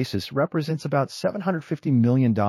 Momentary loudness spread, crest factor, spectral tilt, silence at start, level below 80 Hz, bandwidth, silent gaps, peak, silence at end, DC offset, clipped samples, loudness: 7 LU; 14 dB; -7.5 dB/octave; 0 s; -62 dBFS; 13 kHz; none; -10 dBFS; 0 s; under 0.1%; under 0.1%; -24 LUFS